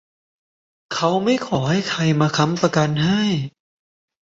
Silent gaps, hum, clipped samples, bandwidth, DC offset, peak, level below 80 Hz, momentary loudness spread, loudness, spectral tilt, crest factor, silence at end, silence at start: none; none; under 0.1%; 7.8 kHz; under 0.1%; -2 dBFS; -56 dBFS; 5 LU; -19 LUFS; -5.5 dB/octave; 18 dB; 0.75 s; 0.9 s